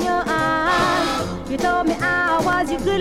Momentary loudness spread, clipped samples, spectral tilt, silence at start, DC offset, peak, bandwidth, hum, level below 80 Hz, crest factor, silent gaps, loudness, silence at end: 5 LU; under 0.1%; -4.5 dB/octave; 0 s; under 0.1%; -8 dBFS; 16.5 kHz; none; -40 dBFS; 12 dB; none; -19 LUFS; 0 s